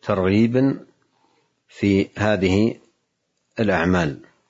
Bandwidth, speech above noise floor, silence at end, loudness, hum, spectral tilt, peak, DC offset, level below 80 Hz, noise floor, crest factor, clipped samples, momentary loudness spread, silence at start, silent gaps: 7.8 kHz; 54 dB; 0.35 s; -20 LUFS; none; -7 dB/octave; -4 dBFS; under 0.1%; -54 dBFS; -73 dBFS; 18 dB; under 0.1%; 9 LU; 0.05 s; none